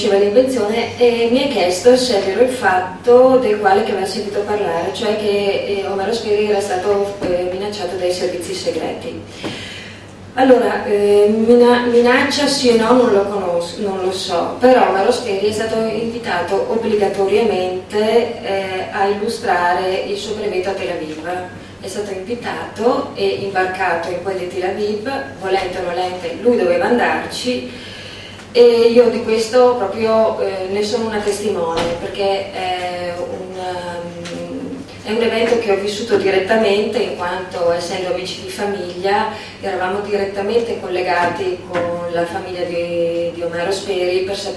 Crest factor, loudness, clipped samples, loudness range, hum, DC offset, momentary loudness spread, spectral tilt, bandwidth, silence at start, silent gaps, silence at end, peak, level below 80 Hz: 16 dB; -17 LUFS; under 0.1%; 7 LU; none; under 0.1%; 12 LU; -4.5 dB/octave; 12.5 kHz; 0 s; none; 0 s; 0 dBFS; -50 dBFS